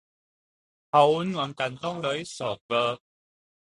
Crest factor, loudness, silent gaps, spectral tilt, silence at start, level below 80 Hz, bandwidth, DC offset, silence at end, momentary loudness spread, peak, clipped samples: 22 dB; -26 LUFS; 2.61-2.69 s; -5 dB/octave; 0.95 s; -68 dBFS; 11.5 kHz; under 0.1%; 0.75 s; 11 LU; -6 dBFS; under 0.1%